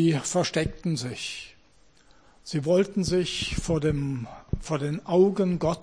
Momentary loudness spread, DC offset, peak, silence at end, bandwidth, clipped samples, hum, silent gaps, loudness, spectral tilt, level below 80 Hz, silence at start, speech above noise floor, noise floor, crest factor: 13 LU; 0.1%; -10 dBFS; 0 s; 10.5 kHz; under 0.1%; none; none; -26 LUFS; -5.5 dB/octave; -44 dBFS; 0 s; 35 dB; -60 dBFS; 16 dB